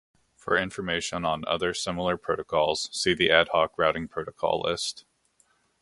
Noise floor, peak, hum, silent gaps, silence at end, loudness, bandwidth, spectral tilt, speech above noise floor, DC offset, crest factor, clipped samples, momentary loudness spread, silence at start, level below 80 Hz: -67 dBFS; -2 dBFS; none; none; 0.8 s; -26 LUFS; 11.5 kHz; -3.5 dB/octave; 41 dB; under 0.1%; 24 dB; under 0.1%; 10 LU; 0.45 s; -54 dBFS